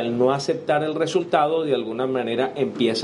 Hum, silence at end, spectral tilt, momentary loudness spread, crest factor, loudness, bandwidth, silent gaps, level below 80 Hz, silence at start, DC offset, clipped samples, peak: none; 0 s; -5.5 dB/octave; 4 LU; 18 dB; -22 LUFS; 11.5 kHz; none; -66 dBFS; 0 s; under 0.1%; under 0.1%; -4 dBFS